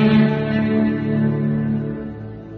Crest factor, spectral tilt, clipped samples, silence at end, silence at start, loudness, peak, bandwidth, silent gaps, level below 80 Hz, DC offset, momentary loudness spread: 14 dB; -10 dB/octave; under 0.1%; 0 s; 0 s; -19 LUFS; -4 dBFS; 4.7 kHz; none; -46 dBFS; under 0.1%; 13 LU